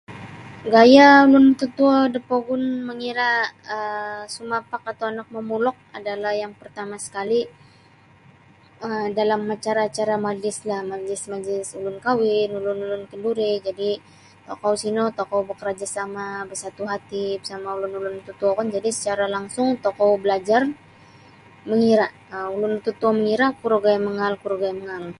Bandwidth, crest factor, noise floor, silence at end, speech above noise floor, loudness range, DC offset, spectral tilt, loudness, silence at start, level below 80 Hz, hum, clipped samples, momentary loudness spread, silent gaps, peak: 11.5 kHz; 22 dB; -52 dBFS; 0.05 s; 31 dB; 9 LU; under 0.1%; -4.5 dB/octave; -21 LUFS; 0.1 s; -64 dBFS; none; under 0.1%; 13 LU; none; 0 dBFS